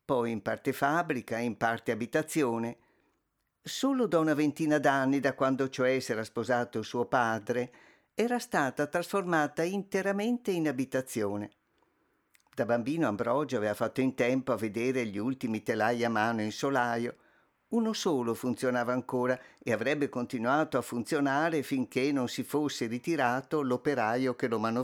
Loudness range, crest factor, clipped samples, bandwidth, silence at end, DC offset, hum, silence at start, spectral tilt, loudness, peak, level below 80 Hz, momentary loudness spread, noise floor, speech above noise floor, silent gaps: 3 LU; 18 dB; under 0.1%; 18 kHz; 0 s; under 0.1%; none; 0.1 s; -5.5 dB/octave; -30 LUFS; -12 dBFS; -74 dBFS; 6 LU; -79 dBFS; 49 dB; none